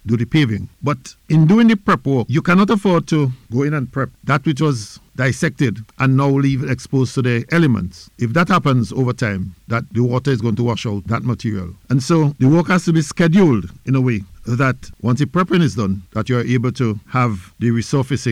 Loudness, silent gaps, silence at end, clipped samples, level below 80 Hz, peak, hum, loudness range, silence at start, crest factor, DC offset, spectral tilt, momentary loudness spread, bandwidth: -17 LUFS; none; 0 s; under 0.1%; -46 dBFS; -6 dBFS; none; 3 LU; 0.05 s; 10 dB; under 0.1%; -7 dB/octave; 9 LU; 12 kHz